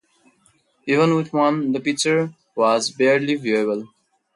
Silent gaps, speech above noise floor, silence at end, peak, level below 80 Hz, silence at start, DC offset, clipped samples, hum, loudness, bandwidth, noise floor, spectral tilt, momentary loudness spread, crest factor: none; 42 dB; 0.5 s; -6 dBFS; -70 dBFS; 0.85 s; under 0.1%; under 0.1%; none; -20 LUFS; 11.5 kHz; -61 dBFS; -4.5 dB/octave; 7 LU; 16 dB